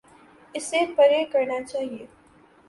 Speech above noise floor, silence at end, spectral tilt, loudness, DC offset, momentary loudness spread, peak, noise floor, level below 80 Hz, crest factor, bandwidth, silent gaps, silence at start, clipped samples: 32 dB; 0.65 s; -2.5 dB/octave; -23 LUFS; under 0.1%; 16 LU; -8 dBFS; -55 dBFS; -68 dBFS; 18 dB; 11.5 kHz; none; 0.55 s; under 0.1%